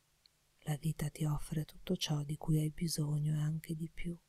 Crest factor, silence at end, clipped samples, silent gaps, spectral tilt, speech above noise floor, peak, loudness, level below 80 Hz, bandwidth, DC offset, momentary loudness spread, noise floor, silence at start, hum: 16 dB; 0.1 s; under 0.1%; none; -6 dB/octave; 35 dB; -22 dBFS; -38 LUFS; -54 dBFS; 14.5 kHz; under 0.1%; 7 LU; -72 dBFS; 0.65 s; none